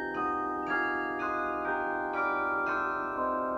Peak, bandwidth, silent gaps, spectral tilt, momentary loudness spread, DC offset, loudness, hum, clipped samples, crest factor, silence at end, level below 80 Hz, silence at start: -18 dBFS; 15 kHz; none; -6 dB/octave; 2 LU; under 0.1%; -31 LUFS; none; under 0.1%; 12 dB; 0 s; -60 dBFS; 0 s